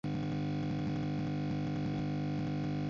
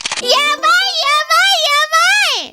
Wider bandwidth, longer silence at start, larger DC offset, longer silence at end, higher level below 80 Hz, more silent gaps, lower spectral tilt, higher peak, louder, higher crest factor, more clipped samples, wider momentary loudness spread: second, 7.2 kHz vs 18 kHz; about the same, 0.05 s vs 0.05 s; neither; about the same, 0 s vs 0.05 s; first, -54 dBFS vs -62 dBFS; neither; first, -7.5 dB/octave vs 2 dB/octave; second, -26 dBFS vs 0 dBFS; second, -36 LUFS vs -11 LUFS; second, 8 dB vs 14 dB; neither; about the same, 0 LU vs 2 LU